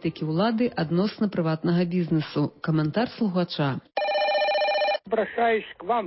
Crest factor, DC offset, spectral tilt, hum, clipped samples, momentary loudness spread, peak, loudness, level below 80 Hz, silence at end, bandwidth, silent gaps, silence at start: 12 dB; under 0.1%; -10.5 dB/octave; none; under 0.1%; 5 LU; -12 dBFS; -25 LUFS; -62 dBFS; 0 s; 5.8 kHz; none; 0.05 s